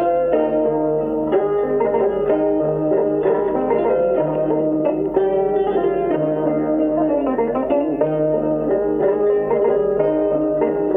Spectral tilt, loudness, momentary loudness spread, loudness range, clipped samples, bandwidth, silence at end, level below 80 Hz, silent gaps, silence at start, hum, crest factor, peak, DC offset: -10.5 dB/octave; -18 LUFS; 2 LU; 1 LU; under 0.1%; 3.7 kHz; 0 s; -46 dBFS; none; 0 s; none; 12 dB; -4 dBFS; under 0.1%